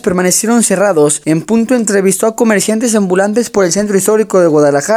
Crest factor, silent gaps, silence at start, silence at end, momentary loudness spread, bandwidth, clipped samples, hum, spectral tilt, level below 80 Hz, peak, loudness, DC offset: 10 dB; none; 0.05 s; 0 s; 3 LU; over 20 kHz; under 0.1%; none; -4.5 dB/octave; -50 dBFS; 0 dBFS; -11 LUFS; under 0.1%